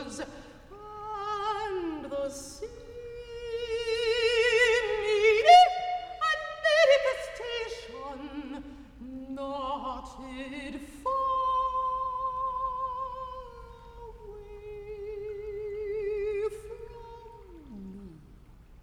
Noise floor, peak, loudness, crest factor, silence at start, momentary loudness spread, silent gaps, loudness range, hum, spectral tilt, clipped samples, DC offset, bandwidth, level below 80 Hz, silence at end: -52 dBFS; -6 dBFS; -27 LUFS; 24 dB; 0 s; 23 LU; none; 15 LU; none; -3 dB/octave; under 0.1%; under 0.1%; 13.5 kHz; -52 dBFS; 0.05 s